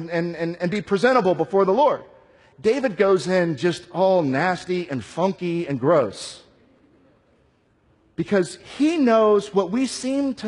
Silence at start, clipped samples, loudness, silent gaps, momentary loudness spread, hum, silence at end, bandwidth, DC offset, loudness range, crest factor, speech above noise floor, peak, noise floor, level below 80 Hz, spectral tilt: 0 s; under 0.1%; -21 LUFS; none; 9 LU; none; 0 s; 11 kHz; under 0.1%; 5 LU; 16 dB; 41 dB; -6 dBFS; -61 dBFS; -62 dBFS; -6 dB/octave